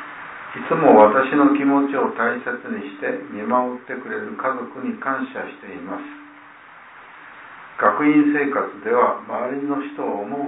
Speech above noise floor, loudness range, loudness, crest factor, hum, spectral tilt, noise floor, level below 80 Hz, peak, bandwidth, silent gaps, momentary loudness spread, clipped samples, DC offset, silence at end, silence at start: 24 dB; 11 LU; -20 LUFS; 20 dB; none; -10.5 dB/octave; -44 dBFS; -68 dBFS; 0 dBFS; 4 kHz; none; 19 LU; under 0.1%; under 0.1%; 0 s; 0 s